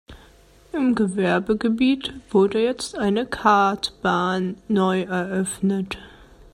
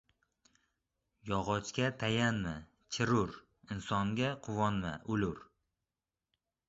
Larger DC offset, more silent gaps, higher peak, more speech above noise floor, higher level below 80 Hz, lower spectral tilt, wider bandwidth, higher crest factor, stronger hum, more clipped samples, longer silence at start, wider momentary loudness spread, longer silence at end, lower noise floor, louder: neither; neither; first, -2 dBFS vs -16 dBFS; second, 30 dB vs over 56 dB; first, -52 dBFS vs -58 dBFS; about the same, -5.5 dB/octave vs -4.5 dB/octave; first, 13.5 kHz vs 8 kHz; about the same, 20 dB vs 20 dB; neither; neither; second, 0.1 s vs 1.25 s; second, 7 LU vs 12 LU; second, 0.45 s vs 1.25 s; second, -51 dBFS vs under -90 dBFS; first, -22 LUFS vs -35 LUFS